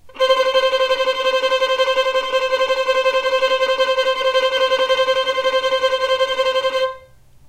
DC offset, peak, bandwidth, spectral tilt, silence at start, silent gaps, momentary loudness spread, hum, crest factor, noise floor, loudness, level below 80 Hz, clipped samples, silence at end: under 0.1%; -2 dBFS; 14.5 kHz; -0.5 dB/octave; 0.05 s; none; 2 LU; none; 16 dB; -45 dBFS; -17 LUFS; -54 dBFS; under 0.1%; 0.5 s